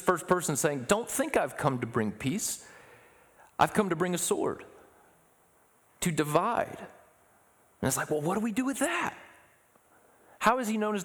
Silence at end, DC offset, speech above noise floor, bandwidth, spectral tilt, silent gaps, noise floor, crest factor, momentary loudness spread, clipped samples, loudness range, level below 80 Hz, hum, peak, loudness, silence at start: 0 s; under 0.1%; 35 dB; over 20 kHz; -4.5 dB/octave; none; -64 dBFS; 22 dB; 10 LU; under 0.1%; 3 LU; -62 dBFS; none; -10 dBFS; -29 LUFS; 0 s